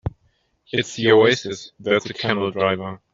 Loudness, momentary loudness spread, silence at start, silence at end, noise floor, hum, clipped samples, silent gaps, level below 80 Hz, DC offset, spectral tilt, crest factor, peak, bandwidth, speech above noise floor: -20 LUFS; 14 LU; 0.05 s; 0.15 s; -65 dBFS; none; under 0.1%; none; -50 dBFS; under 0.1%; -5 dB/octave; 18 dB; -2 dBFS; 7.8 kHz; 45 dB